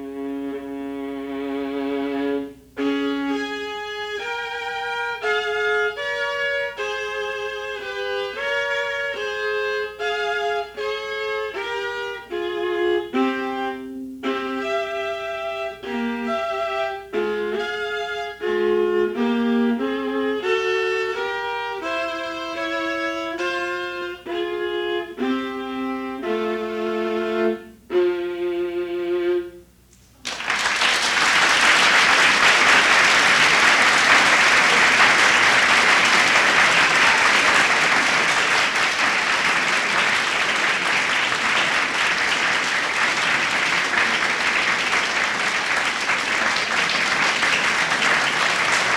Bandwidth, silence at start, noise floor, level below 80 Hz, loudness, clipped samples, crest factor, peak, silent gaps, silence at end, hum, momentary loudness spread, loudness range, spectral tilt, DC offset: 19.5 kHz; 0 s; -52 dBFS; -56 dBFS; -19 LUFS; under 0.1%; 18 dB; -2 dBFS; none; 0 s; none; 14 LU; 12 LU; -1.5 dB/octave; under 0.1%